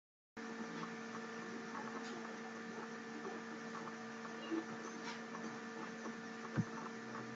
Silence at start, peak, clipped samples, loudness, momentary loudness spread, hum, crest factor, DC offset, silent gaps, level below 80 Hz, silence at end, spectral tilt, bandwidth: 0.35 s; -26 dBFS; under 0.1%; -47 LUFS; 4 LU; none; 20 dB; under 0.1%; none; -84 dBFS; 0 s; -5 dB/octave; 8 kHz